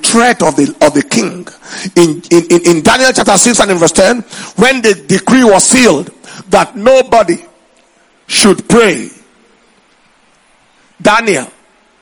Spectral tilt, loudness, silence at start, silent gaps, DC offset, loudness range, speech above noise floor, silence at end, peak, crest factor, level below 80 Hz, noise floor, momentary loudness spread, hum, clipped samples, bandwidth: -3.5 dB/octave; -8 LUFS; 0 s; none; under 0.1%; 6 LU; 40 dB; 0.55 s; 0 dBFS; 10 dB; -42 dBFS; -49 dBFS; 12 LU; none; 1%; over 20 kHz